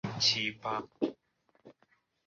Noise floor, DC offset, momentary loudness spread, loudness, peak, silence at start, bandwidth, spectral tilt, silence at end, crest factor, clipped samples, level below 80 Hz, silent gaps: -73 dBFS; under 0.1%; 10 LU; -32 LUFS; -14 dBFS; 0.05 s; 7.4 kHz; -1.5 dB/octave; 0.55 s; 22 dB; under 0.1%; -70 dBFS; none